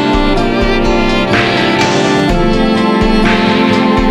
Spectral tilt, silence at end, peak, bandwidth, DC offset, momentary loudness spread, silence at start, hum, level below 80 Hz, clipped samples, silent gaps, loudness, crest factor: -5.5 dB/octave; 0 s; 0 dBFS; 12.5 kHz; under 0.1%; 2 LU; 0 s; none; -20 dBFS; under 0.1%; none; -11 LUFS; 10 dB